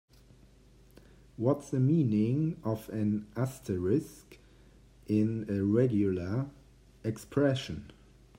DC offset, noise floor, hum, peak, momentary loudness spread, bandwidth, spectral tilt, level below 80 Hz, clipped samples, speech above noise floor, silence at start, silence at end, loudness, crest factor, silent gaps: under 0.1%; -59 dBFS; none; -14 dBFS; 11 LU; 16 kHz; -8 dB/octave; -60 dBFS; under 0.1%; 29 dB; 1.4 s; 0.5 s; -31 LUFS; 16 dB; none